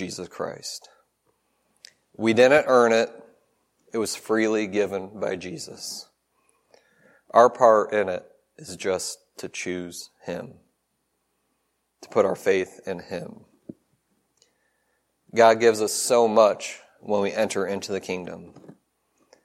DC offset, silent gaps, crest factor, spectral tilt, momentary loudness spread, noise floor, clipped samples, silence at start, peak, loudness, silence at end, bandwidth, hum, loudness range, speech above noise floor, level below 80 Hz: under 0.1%; none; 22 dB; -3.5 dB/octave; 19 LU; -74 dBFS; under 0.1%; 0 s; -2 dBFS; -23 LUFS; 0.75 s; 16 kHz; none; 9 LU; 52 dB; -72 dBFS